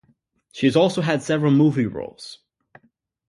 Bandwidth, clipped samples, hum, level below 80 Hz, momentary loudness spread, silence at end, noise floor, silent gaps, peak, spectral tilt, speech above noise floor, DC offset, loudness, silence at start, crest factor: 11.5 kHz; under 0.1%; none; -60 dBFS; 22 LU; 0.95 s; -63 dBFS; none; -4 dBFS; -6.5 dB/octave; 43 dB; under 0.1%; -20 LUFS; 0.55 s; 18 dB